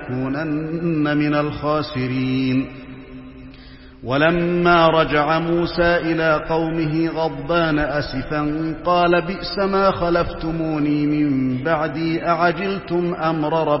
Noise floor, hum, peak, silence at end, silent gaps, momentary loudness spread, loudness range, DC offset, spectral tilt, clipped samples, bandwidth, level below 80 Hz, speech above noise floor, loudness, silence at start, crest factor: -41 dBFS; none; -2 dBFS; 0 s; none; 7 LU; 4 LU; 0.1%; -10.5 dB/octave; under 0.1%; 5.8 kHz; -40 dBFS; 22 dB; -19 LUFS; 0 s; 18 dB